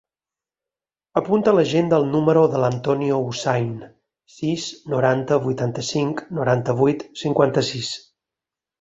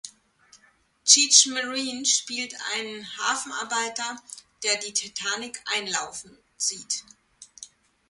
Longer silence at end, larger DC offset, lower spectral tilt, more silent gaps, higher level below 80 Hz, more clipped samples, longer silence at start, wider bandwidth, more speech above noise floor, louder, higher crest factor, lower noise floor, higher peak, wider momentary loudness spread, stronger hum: first, 0.8 s vs 0.45 s; neither; first, -6 dB/octave vs 1.5 dB/octave; neither; first, -58 dBFS vs -74 dBFS; neither; first, 1.15 s vs 0.05 s; second, 8 kHz vs 11.5 kHz; first, over 70 dB vs 37 dB; about the same, -21 LUFS vs -23 LUFS; second, 18 dB vs 28 dB; first, under -90 dBFS vs -62 dBFS; about the same, -2 dBFS vs 0 dBFS; second, 10 LU vs 19 LU; neither